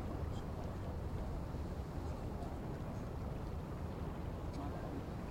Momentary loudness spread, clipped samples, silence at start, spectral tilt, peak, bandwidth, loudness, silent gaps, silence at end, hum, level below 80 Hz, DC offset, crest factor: 1 LU; under 0.1%; 0 s; -8 dB/octave; -30 dBFS; 16.5 kHz; -45 LUFS; none; 0 s; none; -48 dBFS; under 0.1%; 12 dB